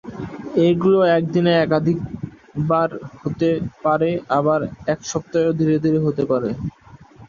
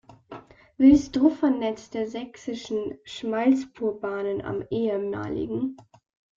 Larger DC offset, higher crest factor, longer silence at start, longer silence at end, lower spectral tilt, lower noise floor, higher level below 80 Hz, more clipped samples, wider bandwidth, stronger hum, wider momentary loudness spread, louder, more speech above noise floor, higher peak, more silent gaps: neither; about the same, 16 dB vs 20 dB; about the same, 0.05 s vs 0.1 s; second, 0.05 s vs 0.55 s; about the same, -7 dB/octave vs -6.5 dB/octave; about the same, -45 dBFS vs -45 dBFS; about the same, -50 dBFS vs -52 dBFS; neither; about the same, 7.4 kHz vs 7.4 kHz; neither; second, 13 LU vs 16 LU; first, -19 LUFS vs -25 LUFS; first, 26 dB vs 21 dB; about the same, -4 dBFS vs -6 dBFS; neither